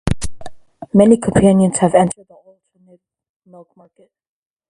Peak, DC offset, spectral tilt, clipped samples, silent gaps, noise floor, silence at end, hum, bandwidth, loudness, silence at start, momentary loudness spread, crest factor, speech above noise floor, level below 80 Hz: 0 dBFS; under 0.1%; -6.5 dB/octave; under 0.1%; none; -52 dBFS; 2.6 s; none; 11.5 kHz; -14 LUFS; 0.05 s; 14 LU; 16 dB; 38 dB; -38 dBFS